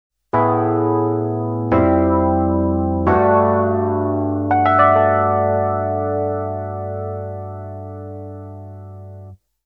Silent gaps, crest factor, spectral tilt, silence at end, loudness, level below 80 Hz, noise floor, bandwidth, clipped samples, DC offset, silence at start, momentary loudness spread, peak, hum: none; 16 dB; -11 dB/octave; 0.3 s; -17 LUFS; -40 dBFS; -40 dBFS; 4.3 kHz; under 0.1%; under 0.1%; 0.35 s; 19 LU; -2 dBFS; none